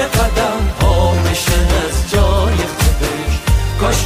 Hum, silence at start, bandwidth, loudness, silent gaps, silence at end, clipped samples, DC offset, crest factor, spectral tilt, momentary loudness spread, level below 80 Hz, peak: none; 0 s; 16 kHz; -15 LUFS; none; 0 s; under 0.1%; under 0.1%; 12 dB; -4.5 dB/octave; 3 LU; -18 dBFS; -2 dBFS